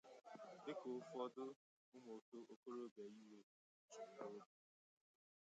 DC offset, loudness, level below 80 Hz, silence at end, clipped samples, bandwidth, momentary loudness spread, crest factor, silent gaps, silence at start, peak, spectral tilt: under 0.1%; -56 LUFS; under -90 dBFS; 1 s; under 0.1%; 8.8 kHz; 13 LU; 20 dB; 1.56-1.92 s, 2.22-2.32 s, 2.56-2.63 s, 2.91-2.96 s, 3.43-3.88 s; 0.05 s; -36 dBFS; -5 dB/octave